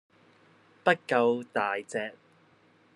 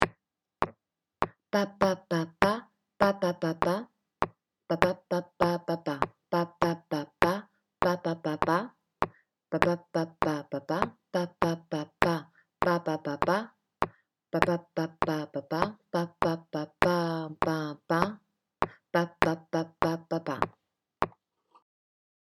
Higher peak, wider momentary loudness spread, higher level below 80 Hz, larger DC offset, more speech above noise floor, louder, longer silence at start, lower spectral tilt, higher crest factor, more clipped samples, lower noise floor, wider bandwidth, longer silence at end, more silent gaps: second, -8 dBFS vs 0 dBFS; first, 10 LU vs 7 LU; second, -84 dBFS vs -56 dBFS; neither; second, 35 dB vs 45 dB; about the same, -29 LUFS vs -31 LUFS; first, 0.85 s vs 0 s; about the same, -5 dB/octave vs -6 dB/octave; second, 24 dB vs 30 dB; neither; second, -62 dBFS vs -74 dBFS; second, 11.5 kHz vs 19.5 kHz; second, 0.85 s vs 1.15 s; neither